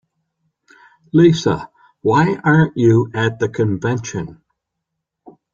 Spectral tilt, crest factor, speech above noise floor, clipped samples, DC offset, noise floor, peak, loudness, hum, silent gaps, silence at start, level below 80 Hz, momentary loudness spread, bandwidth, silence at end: -7 dB/octave; 16 dB; 63 dB; under 0.1%; under 0.1%; -78 dBFS; -2 dBFS; -16 LUFS; none; none; 1.15 s; -52 dBFS; 11 LU; 7.6 kHz; 1.2 s